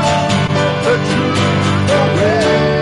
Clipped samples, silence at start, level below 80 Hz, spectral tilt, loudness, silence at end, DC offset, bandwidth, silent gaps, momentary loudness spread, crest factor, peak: under 0.1%; 0 s; -38 dBFS; -5.5 dB/octave; -13 LUFS; 0 s; under 0.1%; 11.5 kHz; none; 2 LU; 10 dB; -4 dBFS